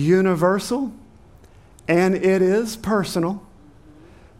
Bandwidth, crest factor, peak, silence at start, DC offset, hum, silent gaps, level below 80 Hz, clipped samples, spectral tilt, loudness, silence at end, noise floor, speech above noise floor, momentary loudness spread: 16 kHz; 16 dB; -6 dBFS; 0 s; under 0.1%; none; none; -52 dBFS; under 0.1%; -6.5 dB/octave; -20 LUFS; 1 s; -48 dBFS; 29 dB; 10 LU